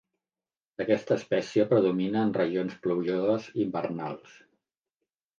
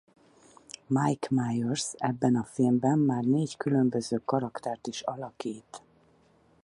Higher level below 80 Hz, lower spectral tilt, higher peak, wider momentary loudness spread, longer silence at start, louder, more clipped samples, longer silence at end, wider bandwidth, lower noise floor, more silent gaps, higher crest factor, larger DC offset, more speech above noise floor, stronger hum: about the same, -72 dBFS vs -68 dBFS; about the same, -7 dB/octave vs -6 dB/octave; about the same, -10 dBFS vs -12 dBFS; about the same, 11 LU vs 13 LU; about the same, 0.8 s vs 0.9 s; about the same, -28 LUFS vs -29 LUFS; neither; first, 1.2 s vs 0.85 s; second, 7.4 kHz vs 11.5 kHz; first, under -90 dBFS vs -63 dBFS; neither; about the same, 18 dB vs 16 dB; neither; first, over 63 dB vs 35 dB; neither